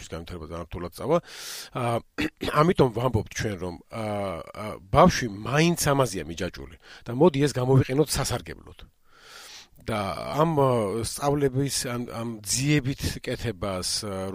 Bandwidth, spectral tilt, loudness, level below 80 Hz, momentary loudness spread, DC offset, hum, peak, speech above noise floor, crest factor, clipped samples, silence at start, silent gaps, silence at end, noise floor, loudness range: 16 kHz; -5 dB/octave; -25 LUFS; -46 dBFS; 16 LU; under 0.1%; none; -4 dBFS; 23 dB; 22 dB; under 0.1%; 0 s; none; 0 s; -49 dBFS; 3 LU